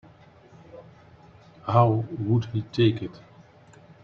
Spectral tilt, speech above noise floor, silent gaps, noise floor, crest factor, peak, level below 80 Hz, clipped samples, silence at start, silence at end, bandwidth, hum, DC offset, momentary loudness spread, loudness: -9 dB/octave; 29 dB; none; -52 dBFS; 22 dB; -4 dBFS; -60 dBFS; under 0.1%; 0.75 s; 0.85 s; 6.4 kHz; none; under 0.1%; 17 LU; -24 LUFS